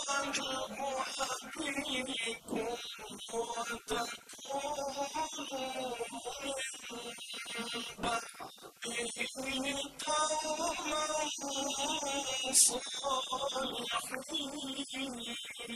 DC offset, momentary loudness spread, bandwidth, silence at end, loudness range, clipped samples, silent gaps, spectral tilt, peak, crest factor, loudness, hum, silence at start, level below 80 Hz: under 0.1%; 8 LU; 14 kHz; 0 s; 7 LU; under 0.1%; none; -0.5 dB/octave; -10 dBFS; 26 dB; -35 LUFS; none; 0 s; -66 dBFS